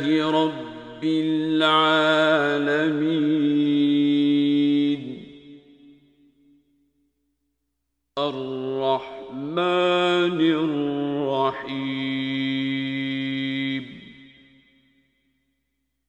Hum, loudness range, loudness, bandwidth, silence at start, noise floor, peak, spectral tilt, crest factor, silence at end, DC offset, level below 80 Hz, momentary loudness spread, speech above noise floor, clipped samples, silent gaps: none; 11 LU; -22 LUFS; 8.8 kHz; 0 s; -78 dBFS; -6 dBFS; -6.5 dB/octave; 18 dB; 1.85 s; under 0.1%; -66 dBFS; 11 LU; 57 dB; under 0.1%; none